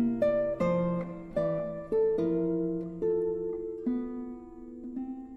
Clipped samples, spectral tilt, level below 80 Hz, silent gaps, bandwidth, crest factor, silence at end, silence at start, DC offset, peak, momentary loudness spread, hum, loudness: under 0.1%; -10 dB/octave; -54 dBFS; none; 7.2 kHz; 14 dB; 0 s; 0 s; under 0.1%; -16 dBFS; 13 LU; none; -31 LUFS